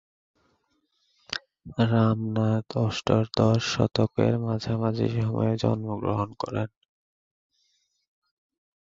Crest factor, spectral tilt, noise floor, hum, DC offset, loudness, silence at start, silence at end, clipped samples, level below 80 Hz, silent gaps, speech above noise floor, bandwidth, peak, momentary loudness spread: 22 dB; -7 dB/octave; -72 dBFS; none; under 0.1%; -26 LUFS; 1.3 s; 2.15 s; under 0.1%; -54 dBFS; none; 47 dB; 7.6 kHz; -6 dBFS; 11 LU